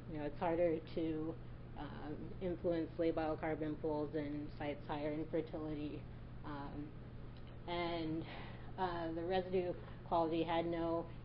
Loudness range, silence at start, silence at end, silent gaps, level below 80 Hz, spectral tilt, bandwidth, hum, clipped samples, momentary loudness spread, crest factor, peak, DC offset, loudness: 5 LU; 0 s; 0 s; none; -54 dBFS; -5.5 dB/octave; 5.4 kHz; none; under 0.1%; 13 LU; 16 dB; -24 dBFS; under 0.1%; -41 LUFS